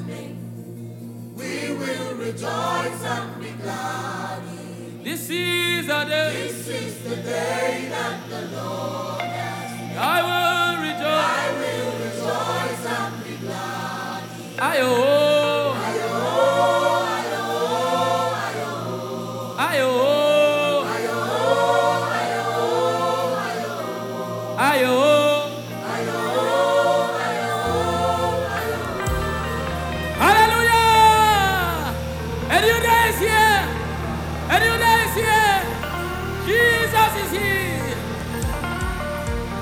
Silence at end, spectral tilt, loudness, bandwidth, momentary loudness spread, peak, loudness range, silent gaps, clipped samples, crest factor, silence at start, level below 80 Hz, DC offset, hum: 0 s; -4 dB/octave; -21 LUFS; 19.5 kHz; 13 LU; -4 dBFS; 9 LU; none; under 0.1%; 18 dB; 0 s; -38 dBFS; under 0.1%; none